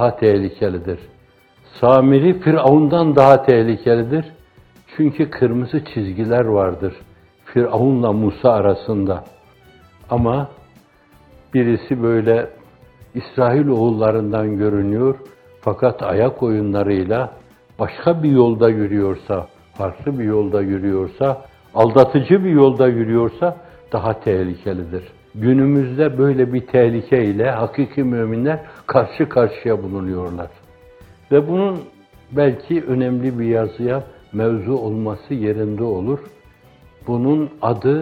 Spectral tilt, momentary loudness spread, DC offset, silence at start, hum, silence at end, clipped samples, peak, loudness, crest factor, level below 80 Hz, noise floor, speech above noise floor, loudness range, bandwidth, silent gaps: -10 dB/octave; 13 LU; under 0.1%; 0 s; none; 0 s; under 0.1%; 0 dBFS; -17 LUFS; 18 dB; -50 dBFS; -51 dBFS; 35 dB; 6 LU; 6.2 kHz; none